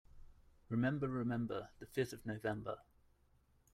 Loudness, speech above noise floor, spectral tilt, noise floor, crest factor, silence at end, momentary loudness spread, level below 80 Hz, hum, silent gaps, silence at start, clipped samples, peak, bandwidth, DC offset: -41 LUFS; 32 dB; -7 dB/octave; -73 dBFS; 18 dB; 0.9 s; 9 LU; -66 dBFS; none; none; 0.15 s; under 0.1%; -24 dBFS; 15.5 kHz; under 0.1%